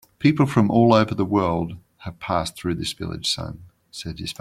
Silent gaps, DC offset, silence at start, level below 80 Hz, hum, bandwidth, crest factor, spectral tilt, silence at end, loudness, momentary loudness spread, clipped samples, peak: none; under 0.1%; 0.2 s; -50 dBFS; none; 15 kHz; 20 dB; -6 dB/octave; 0.1 s; -21 LUFS; 18 LU; under 0.1%; -2 dBFS